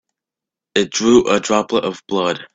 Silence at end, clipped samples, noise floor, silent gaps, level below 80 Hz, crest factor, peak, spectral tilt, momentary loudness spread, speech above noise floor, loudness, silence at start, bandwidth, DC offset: 0.1 s; under 0.1%; -87 dBFS; none; -52 dBFS; 18 dB; 0 dBFS; -3.5 dB/octave; 8 LU; 70 dB; -17 LUFS; 0.75 s; 8 kHz; under 0.1%